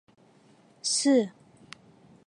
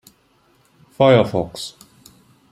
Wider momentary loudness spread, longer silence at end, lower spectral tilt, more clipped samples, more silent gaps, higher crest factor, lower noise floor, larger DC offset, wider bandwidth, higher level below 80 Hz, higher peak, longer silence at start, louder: first, 26 LU vs 18 LU; first, 0.95 s vs 0.8 s; second, -2.5 dB/octave vs -6.5 dB/octave; neither; neither; about the same, 18 dB vs 20 dB; about the same, -59 dBFS vs -58 dBFS; neither; second, 11.5 kHz vs 15 kHz; second, -80 dBFS vs -54 dBFS; second, -12 dBFS vs -2 dBFS; second, 0.85 s vs 1 s; second, -26 LUFS vs -17 LUFS